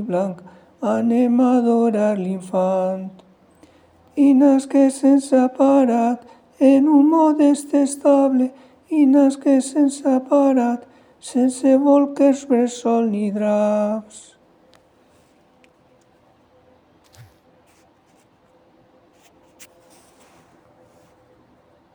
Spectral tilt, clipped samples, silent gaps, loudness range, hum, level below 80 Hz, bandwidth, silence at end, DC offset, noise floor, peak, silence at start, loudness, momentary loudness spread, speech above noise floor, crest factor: -6.5 dB/octave; under 0.1%; none; 6 LU; none; -72 dBFS; 11 kHz; 7.75 s; under 0.1%; -56 dBFS; -4 dBFS; 0 s; -17 LUFS; 10 LU; 40 dB; 16 dB